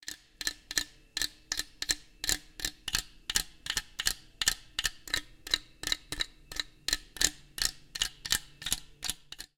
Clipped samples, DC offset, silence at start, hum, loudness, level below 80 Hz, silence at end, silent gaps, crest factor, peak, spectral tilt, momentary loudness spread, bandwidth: under 0.1%; under 0.1%; 0.05 s; none; -33 LUFS; -50 dBFS; 0.15 s; none; 30 dB; -6 dBFS; 0.5 dB/octave; 7 LU; 17 kHz